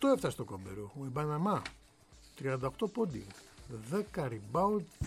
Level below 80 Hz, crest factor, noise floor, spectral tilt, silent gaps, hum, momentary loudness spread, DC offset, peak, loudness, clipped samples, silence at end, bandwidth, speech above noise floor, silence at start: -56 dBFS; 20 dB; -60 dBFS; -6.5 dB/octave; none; none; 15 LU; under 0.1%; -16 dBFS; -36 LUFS; under 0.1%; 0 s; 16 kHz; 25 dB; 0 s